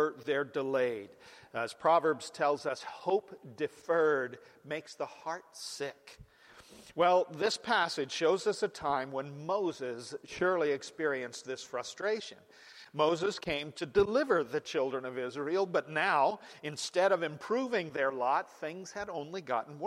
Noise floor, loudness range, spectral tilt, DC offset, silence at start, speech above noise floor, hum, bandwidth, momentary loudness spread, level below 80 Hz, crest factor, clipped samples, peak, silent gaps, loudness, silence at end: -56 dBFS; 4 LU; -4 dB/octave; under 0.1%; 0 s; 24 dB; none; 14 kHz; 13 LU; -68 dBFS; 18 dB; under 0.1%; -14 dBFS; none; -33 LUFS; 0 s